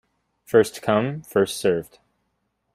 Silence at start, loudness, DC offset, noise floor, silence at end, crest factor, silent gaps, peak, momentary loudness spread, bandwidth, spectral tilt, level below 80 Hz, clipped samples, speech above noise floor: 0.5 s; -22 LUFS; under 0.1%; -73 dBFS; 0.9 s; 20 dB; none; -4 dBFS; 5 LU; 16 kHz; -5 dB/octave; -62 dBFS; under 0.1%; 52 dB